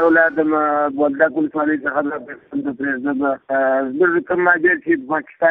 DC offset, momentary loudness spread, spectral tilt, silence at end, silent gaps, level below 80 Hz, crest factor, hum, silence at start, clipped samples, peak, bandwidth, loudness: under 0.1%; 9 LU; -9.5 dB/octave; 0 s; none; -60 dBFS; 16 dB; none; 0 s; under 0.1%; 0 dBFS; 3.9 kHz; -18 LUFS